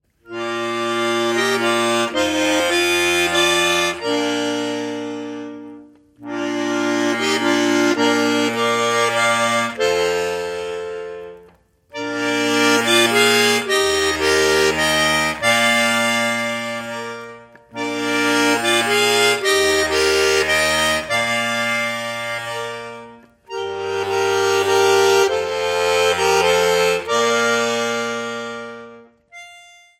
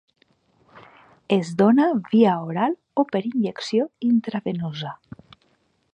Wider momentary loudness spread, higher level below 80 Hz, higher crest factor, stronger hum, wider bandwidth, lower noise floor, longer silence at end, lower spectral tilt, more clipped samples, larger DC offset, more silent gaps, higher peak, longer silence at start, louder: first, 14 LU vs 11 LU; first, -50 dBFS vs -68 dBFS; about the same, 16 dB vs 18 dB; neither; first, 16 kHz vs 8.8 kHz; second, -51 dBFS vs -66 dBFS; second, 0.4 s vs 1 s; second, -2.5 dB/octave vs -7 dB/octave; neither; neither; neither; about the same, -2 dBFS vs -4 dBFS; second, 0.3 s vs 1.3 s; first, -17 LUFS vs -22 LUFS